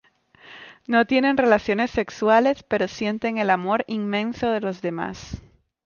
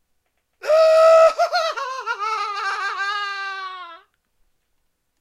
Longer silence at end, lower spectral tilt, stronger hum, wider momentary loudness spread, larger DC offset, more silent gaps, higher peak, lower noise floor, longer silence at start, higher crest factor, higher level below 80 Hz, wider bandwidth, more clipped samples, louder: second, 0.45 s vs 1.25 s; first, -6 dB/octave vs 0.5 dB/octave; neither; about the same, 18 LU vs 18 LU; neither; neither; about the same, -6 dBFS vs -4 dBFS; second, -51 dBFS vs -70 dBFS; second, 0.45 s vs 0.65 s; about the same, 18 dB vs 16 dB; first, -52 dBFS vs -66 dBFS; second, 7.2 kHz vs 12 kHz; neither; second, -22 LUFS vs -18 LUFS